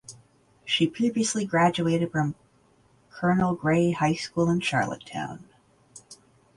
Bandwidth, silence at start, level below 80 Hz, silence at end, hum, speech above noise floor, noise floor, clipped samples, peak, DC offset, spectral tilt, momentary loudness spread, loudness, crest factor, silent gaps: 11.5 kHz; 0.1 s; -58 dBFS; 0.45 s; none; 37 dB; -61 dBFS; under 0.1%; -8 dBFS; under 0.1%; -5 dB/octave; 21 LU; -25 LUFS; 18 dB; none